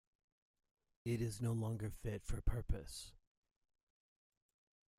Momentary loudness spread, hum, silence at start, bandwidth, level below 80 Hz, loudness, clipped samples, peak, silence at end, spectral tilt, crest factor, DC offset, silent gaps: 10 LU; none; 1.05 s; 15.5 kHz; -50 dBFS; -44 LUFS; under 0.1%; -24 dBFS; 1.85 s; -6.5 dB/octave; 22 dB; under 0.1%; none